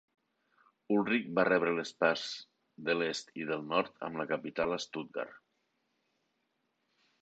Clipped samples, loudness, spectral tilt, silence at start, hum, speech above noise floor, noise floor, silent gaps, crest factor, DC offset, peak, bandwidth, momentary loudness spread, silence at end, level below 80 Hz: under 0.1%; -33 LUFS; -4.5 dB/octave; 0.9 s; none; 47 dB; -80 dBFS; none; 22 dB; under 0.1%; -14 dBFS; 8.8 kHz; 12 LU; 1.85 s; -74 dBFS